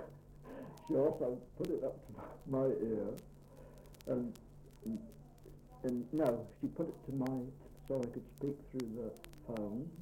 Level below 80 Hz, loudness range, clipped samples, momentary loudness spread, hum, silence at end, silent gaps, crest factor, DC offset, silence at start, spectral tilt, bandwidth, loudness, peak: -62 dBFS; 4 LU; under 0.1%; 22 LU; none; 0 s; none; 20 dB; under 0.1%; 0 s; -8 dB/octave; 16.5 kHz; -40 LUFS; -20 dBFS